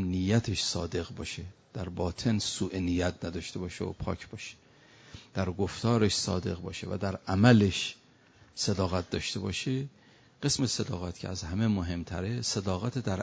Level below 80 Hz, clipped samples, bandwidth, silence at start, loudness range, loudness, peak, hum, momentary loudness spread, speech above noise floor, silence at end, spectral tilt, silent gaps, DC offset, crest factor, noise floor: -46 dBFS; under 0.1%; 8 kHz; 0 s; 5 LU; -31 LUFS; -8 dBFS; none; 12 LU; 29 dB; 0 s; -5 dB/octave; none; under 0.1%; 22 dB; -60 dBFS